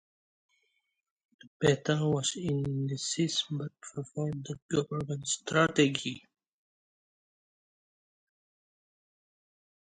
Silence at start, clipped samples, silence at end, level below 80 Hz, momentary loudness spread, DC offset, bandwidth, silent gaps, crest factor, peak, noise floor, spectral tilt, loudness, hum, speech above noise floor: 1.6 s; under 0.1%; 3.75 s; -66 dBFS; 12 LU; under 0.1%; 10.5 kHz; 4.62-4.69 s; 24 dB; -10 dBFS; -77 dBFS; -4.5 dB/octave; -31 LUFS; none; 46 dB